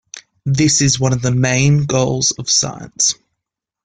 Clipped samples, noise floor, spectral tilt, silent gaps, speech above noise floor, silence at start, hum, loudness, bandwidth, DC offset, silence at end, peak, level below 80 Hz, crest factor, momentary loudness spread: under 0.1%; -81 dBFS; -3.5 dB/octave; none; 66 dB; 0.15 s; none; -15 LUFS; 9.6 kHz; under 0.1%; 0.75 s; -2 dBFS; -46 dBFS; 14 dB; 8 LU